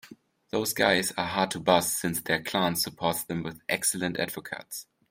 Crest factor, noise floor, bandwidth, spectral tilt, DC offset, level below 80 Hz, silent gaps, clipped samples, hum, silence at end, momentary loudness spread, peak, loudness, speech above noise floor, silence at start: 22 dB; -53 dBFS; 16.5 kHz; -3 dB/octave; under 0.1%; -64 dBFS; none; under 0.1%; none; 0.25 s; 12 LU; -6 dBFS; -27 LUFS; 25 dB; 0.05 s